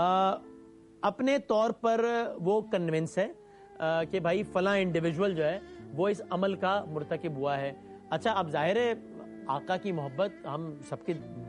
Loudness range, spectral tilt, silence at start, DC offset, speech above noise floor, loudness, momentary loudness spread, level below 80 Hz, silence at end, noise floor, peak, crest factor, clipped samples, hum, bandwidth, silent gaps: 2 LU; -6.5 dB/octave; 0 s; under 0.1%; 23 dB; -31 LUFS; 11 LU; -66 dBFS; 0 s; -53 dBFS; -14 dBFS; 16 dB; under 0.1%; none; 11.5 kHz; none